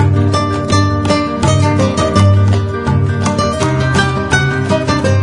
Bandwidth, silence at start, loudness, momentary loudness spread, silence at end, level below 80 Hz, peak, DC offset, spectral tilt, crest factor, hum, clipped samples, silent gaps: 11 kHz; 0 s; -13 LUFS; 4 LU; 0 s; -34 dBFS; 0 dBFS; under 0.1%; -6 dB/octave; 12 dB; none; under 0.1%; none